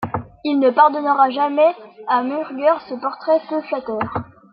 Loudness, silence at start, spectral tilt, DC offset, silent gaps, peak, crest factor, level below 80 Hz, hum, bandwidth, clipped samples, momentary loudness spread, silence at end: -18 LUFS; 0 s; -9 dB/octave; under 0.1%; none; -2 dBFS; 16 dB; -58 dBFS; none; 5.4 kHz; under 0.1%; 11 LU; 0.3 s